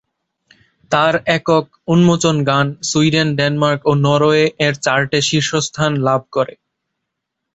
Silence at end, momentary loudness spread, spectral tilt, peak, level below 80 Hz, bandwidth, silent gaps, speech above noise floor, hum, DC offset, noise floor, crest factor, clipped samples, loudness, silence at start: 1.1 s; 5 LU; -5 dB/octave; -2 dBFS; -52 dBFS; 8.2 kHz; none; 62 dB; none; under 0.1%; -77 dBFS; 14 dB; under 0.1%; -15 LUFS; 0.9 s